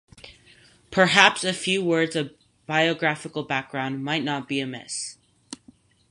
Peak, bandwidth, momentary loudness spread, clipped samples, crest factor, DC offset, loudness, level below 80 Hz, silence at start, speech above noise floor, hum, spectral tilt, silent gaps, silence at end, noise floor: -2 dBFS; 11.5 kHz; 19 LU; under 0.1%; 24 dB; under 0.1%; -23 LUFS; -64 dBFS; 0.25 s; 32 dB; none; -3.5 dB/octave; none; 0.55 s; -56 dBFS